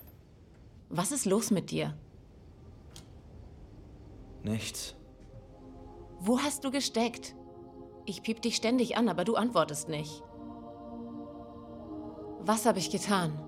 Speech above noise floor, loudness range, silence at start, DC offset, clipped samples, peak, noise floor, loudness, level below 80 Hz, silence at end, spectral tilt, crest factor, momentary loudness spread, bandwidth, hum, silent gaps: 25 dB; 11 LU; 0 s; under 0.1%; under 0.1%; -12 dBFS; -55 dBFS; -32 LUFS; -58 dBFS; 0 s; -4 dB/octave; 22 dB; 24 LU; 16 kHz; none; none